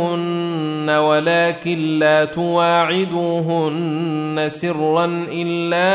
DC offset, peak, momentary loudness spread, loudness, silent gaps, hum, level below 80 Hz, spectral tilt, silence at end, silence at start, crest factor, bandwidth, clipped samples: under 0.1%; -4 dBFS; 6 LU; -18 LUFS; none; none; -62 dBFS; -10 dB/octave; 0 s; 0 s; 14 dB; 4 kHz; under 0.1%